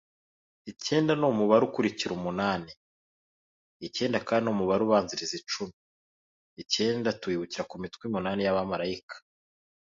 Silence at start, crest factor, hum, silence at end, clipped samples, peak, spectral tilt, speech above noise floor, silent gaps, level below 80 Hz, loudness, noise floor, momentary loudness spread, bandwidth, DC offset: 0.65 s; 20 dB; none; 0.75 s; under 0.1%; -8 dBFS; -5 dB/octave; over 62 dB; 2.77-3.80 s, 5.73-6.56 s, 9.03-9.08 s; -64 dBFS; -28 LUFS; under -90 dBFS; 16 LU; 7.8 kHz; under 0.1%